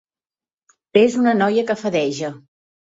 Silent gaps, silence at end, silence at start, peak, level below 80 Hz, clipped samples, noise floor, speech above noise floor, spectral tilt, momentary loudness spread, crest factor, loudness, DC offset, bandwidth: none; 0.6 s; 0.95 s; -2 dBFS; -64 dBFS; under 0.1%; under -90 dBFS; over 73 dB; -5.5 dB/octave; 10 LU; 18 dB; -18 LUFS; under 0.1%; 8 kHz